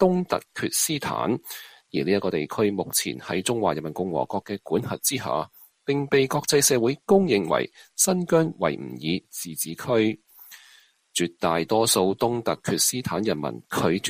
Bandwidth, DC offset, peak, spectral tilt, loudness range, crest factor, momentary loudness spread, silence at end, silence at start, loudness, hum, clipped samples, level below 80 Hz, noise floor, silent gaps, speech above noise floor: 15.5 kHz; under 0.1%; -4 dBFS; -4 dB/octave; 5 LU; 20 dB; 10 LU; 0 s; 0 s; -24 LUFS; none; under 0.1%; -60 dBFS; -56 dBFS; none; 32 dB